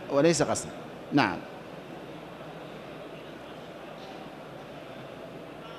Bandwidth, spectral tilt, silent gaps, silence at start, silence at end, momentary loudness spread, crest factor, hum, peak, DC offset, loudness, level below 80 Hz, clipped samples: 13.5 kHz; -4.5 dB/octave; none; 0 s; 0 s; 18 LU; 24 dB; none; -8 dBFS; under 0.1%; -32 LUFS; -64 dBFS; under 0.1%